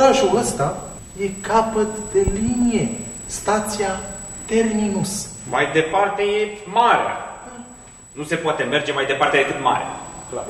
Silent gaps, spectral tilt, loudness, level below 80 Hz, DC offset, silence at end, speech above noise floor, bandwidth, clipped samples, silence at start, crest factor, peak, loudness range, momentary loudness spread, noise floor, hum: none; -4 dB/octave; -20 LUFS; -40 dBFS; under 0.1%; 0 s; 22 dB; 16 kHz; under 0.1%; 0 s; 18 dB; -2 dBFS; 2 LU; 15 LU; -42 dBFS; none